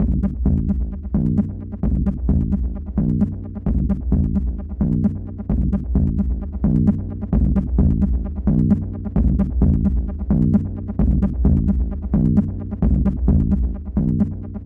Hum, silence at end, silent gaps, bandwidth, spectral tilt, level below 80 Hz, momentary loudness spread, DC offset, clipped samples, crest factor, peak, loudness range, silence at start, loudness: none; 0 s; none; 2.4 kHz; -12.5 dB/octave; -22 dBFS; 6 LU; under 0.1%; under 0.1%; 12 dB; -6 dBFS; 2 LU; 0 s; -20 LUFS